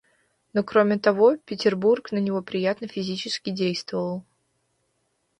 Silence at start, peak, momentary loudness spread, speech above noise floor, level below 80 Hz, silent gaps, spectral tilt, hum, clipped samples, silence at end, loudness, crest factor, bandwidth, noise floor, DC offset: 0.55 s; -6 dBFS; 10 LU; 49 dB; -68 dBFS; none; -6 dB/octave; none; under 0.1%; 1.2 s; -24 LUFS; 18 dB; 10.5 kHz; -72 dBFS; under 0.1%